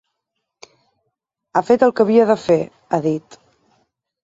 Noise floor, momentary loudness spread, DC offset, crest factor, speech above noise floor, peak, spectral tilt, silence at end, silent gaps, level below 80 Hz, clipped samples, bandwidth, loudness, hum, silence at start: -77 dBFS; 9 LU; under 0.1%; 18 dB; 62 dB; -2 dBFS; -7 dB/octave; 1.05 s; none; -62 dBFS; under 0.1%; 7.8 kHz; -17 LUFS; none; 1.55 s